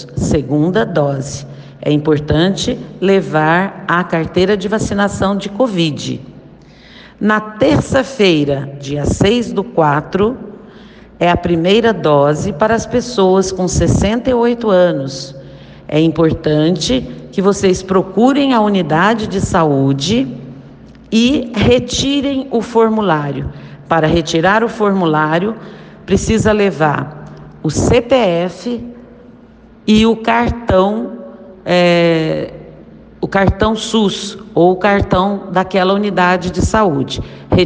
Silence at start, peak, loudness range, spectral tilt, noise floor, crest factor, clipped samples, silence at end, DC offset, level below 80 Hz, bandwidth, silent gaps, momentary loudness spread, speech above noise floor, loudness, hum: 0 s; 0 dBFS; 3 LU; -5.5 dB/octave; -41 dBFS; 14 dB; under 0.1%; 0 s; under 0.1%; -34 dBFS; 9.8 kHz; none; 11 LU; 28 dB; -14 LUFS; none